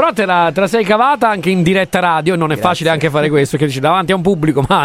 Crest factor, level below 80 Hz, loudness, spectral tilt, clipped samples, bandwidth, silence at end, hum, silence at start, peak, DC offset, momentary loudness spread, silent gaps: 12 dB; -42 dBFS; -13 LUFS; -6 dB/octave; under 0.1%; 16 kHz; 0 s; none; 0 s; 0 dBFS; under 0.1%; 2 LU; none